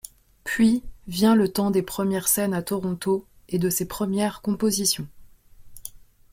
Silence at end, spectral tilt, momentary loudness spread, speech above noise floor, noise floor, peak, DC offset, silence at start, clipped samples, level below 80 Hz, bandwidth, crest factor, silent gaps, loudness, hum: 0.35 s; -4.5 dB/octave; 19 LU; 24 dB; -47 dBFS; -6 dBFS; under 0.1%; 0.45 s; under 0.1%; -52 dBFS; 16.5 kHz; 18 dB; none; -23 LUFS; none